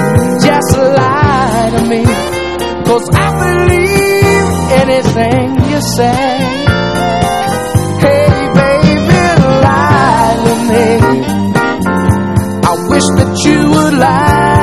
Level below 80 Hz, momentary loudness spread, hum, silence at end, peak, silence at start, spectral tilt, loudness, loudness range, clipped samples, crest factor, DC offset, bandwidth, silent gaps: -26 dBFS; 4 LU; none; 0 s; 0 dBFS; 0 s; -6 dB/octave; -10 LUFS; 2 LU; 0.9%; 10 dB; 1%; 14 kHz; none